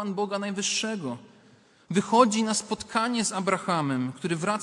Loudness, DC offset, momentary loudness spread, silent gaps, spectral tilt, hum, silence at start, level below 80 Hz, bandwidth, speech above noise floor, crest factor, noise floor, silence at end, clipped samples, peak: -26 LUFS; under 0.1%; 9 LU; none; -4 dB/octave; none; 0 s; -68 dBFS; 11.5 kHz; 31 dB; 22 dB; -58 dBFS; 0 s; under 0.1%; -4 dBFS